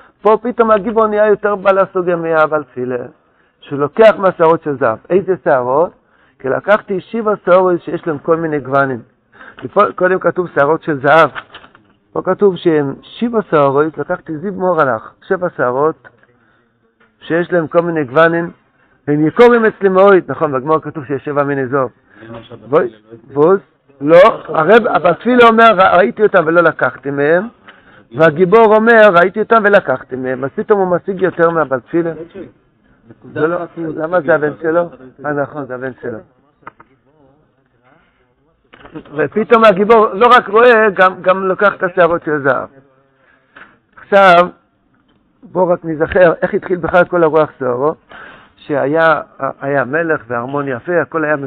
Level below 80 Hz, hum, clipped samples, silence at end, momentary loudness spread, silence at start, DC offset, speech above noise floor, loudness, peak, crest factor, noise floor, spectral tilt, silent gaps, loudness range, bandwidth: -50 dBFS; none; 0.2%; 0 s; 14 LU; 0.25 s; under 0.1%; 44 dB; -12 LUFS; 0 dBFS; 14 dB; -57 dBFS; -7.5 dB/octave; none; 8 LU; 7.6 kHz